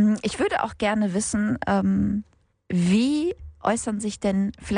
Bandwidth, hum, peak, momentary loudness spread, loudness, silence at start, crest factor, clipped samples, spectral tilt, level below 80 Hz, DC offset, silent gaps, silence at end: 10.5 kHz; none; -6 dBFS; 7 LU; -24 LUFS; 0 s; 16 dB; under 0.1%; -5.5 dB/octave; -48 dBFS; under 0.1%; none; 0 s